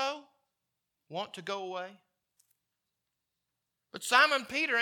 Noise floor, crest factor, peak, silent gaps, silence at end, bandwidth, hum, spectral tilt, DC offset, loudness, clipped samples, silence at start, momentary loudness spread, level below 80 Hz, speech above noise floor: -86 dBFS; 26 dB; -8 dBFS; none; 0 s; 19 kHz; none; -1.5 dB/octave; under 0.1%; -29 LUFS; under 0.1%; 0 s; 21 LU; -82 dBFS; 55 dB